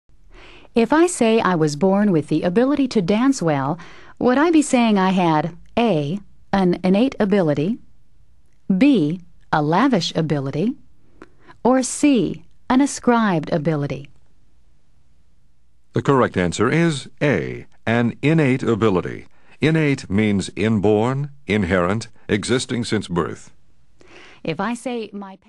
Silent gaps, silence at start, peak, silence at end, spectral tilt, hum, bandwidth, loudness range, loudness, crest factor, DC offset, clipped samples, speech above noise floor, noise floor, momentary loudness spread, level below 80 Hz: none; 0.75 s; -2 dBFS; 0.15 s; -6 dB/octave; none; 12 kHz; 5 LU; -19 LUFS; 18 dB; 0.5%; under 0.1%; 42 dB; -60 dBFS; 10 LU; -50 dBFS